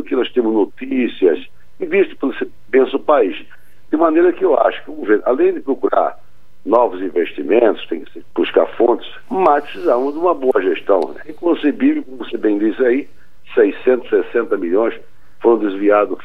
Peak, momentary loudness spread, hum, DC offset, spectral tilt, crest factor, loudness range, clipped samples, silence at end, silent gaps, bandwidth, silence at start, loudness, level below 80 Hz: 0 dBFS; 9 LU; none; 3%; -7 dB/octave; 16 dB; 2 LU; under 0.1%; 0.1 s; none; 4.8 kHz; 0 s; -16 LUFS; -58 dBFS